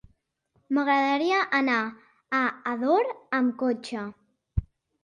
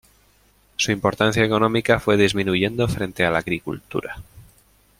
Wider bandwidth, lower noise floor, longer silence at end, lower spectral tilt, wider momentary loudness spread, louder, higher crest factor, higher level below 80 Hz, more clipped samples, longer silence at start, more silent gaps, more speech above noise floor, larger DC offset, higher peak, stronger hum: second, 10.5 kHz vs 16.5 kHz; first, -71 dBFS vs -58 dBFS; second, 0.4 s vs 0.6 s; about the same, -6 dB/octave vs -5 dB/octave; about the same, 11 LU vs 11 LU; second, -26 LUFS vs -20 LUFS; about the same, 16 dB vs 20 dB; about the same, -46 dBFS vs -46 dBFS; neither; about the same, 0.7 s vs 0.8 s; neither; first, 46 dB vs 37 dB; neither; second, -12 dBFS vs -2 dBFS; neither